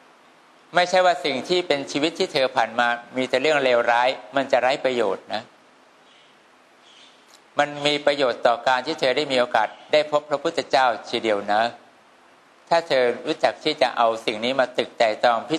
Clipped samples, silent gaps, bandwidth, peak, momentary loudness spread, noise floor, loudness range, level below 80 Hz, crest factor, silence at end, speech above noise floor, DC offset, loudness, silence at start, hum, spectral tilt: under 0.1%; none; 12 kHz; -4 dBFS; 6 LU; -54 dBFS; 5 LU; -72 dBFS; 18 dB; 0 s; 33 dB; under 0.1%; -22 LUFS; 0.75 s; none; -3.5 dB/octave